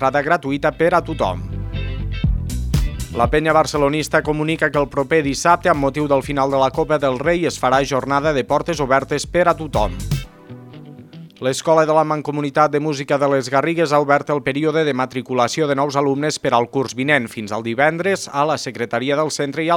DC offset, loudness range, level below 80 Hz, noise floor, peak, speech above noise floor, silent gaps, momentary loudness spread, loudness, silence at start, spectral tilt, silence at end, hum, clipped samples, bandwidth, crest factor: under 0.1%; 3 LU; -32 dBFS; -38 dBFS; 0 dBFS; 21 dB; none; 7 LU; -18 LUFS; 0 s; -5 dB/octave; 0 s; none; under 0.1%; 17.5 kHz; 18 dB